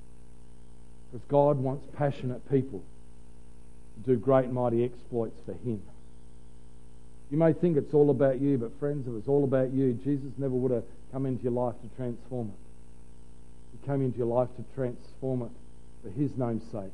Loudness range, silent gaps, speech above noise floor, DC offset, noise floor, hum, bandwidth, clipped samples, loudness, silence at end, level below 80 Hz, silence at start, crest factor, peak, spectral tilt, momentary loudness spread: 7 LU; none; 24 dB; 1%; -53 dBFS; 60 Hz at -55 dBFS; 11.5 kHz; under 0.1%; -29 LUFS; 0.05 s; -54 dBFS; 0 s; 20 dB; -10 dBFS; -10 dB/octave; 14 LU